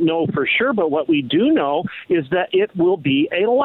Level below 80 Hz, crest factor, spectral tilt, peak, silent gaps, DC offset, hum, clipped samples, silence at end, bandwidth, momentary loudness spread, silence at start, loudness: -58 dBFS; 10 dB; -9.5 dB/octave; -8 dBFS; none; under 0.1%; none; under 0.1%; 0 s; 4.1 kHz; 4 LU; 0 s; -18 LUFS